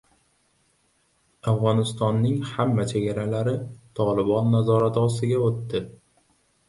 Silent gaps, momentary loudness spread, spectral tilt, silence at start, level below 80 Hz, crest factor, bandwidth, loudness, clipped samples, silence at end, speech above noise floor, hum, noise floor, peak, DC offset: none; 10 LU; -7.5 dB/octave; 1.45 s; -56 dBFS; 16 dB; 11.5 kHz; -24 LUFS; under 0.1%; 0.8 s; 44 dB; none; -66 dBFS; -8 dBFS; under 0.1%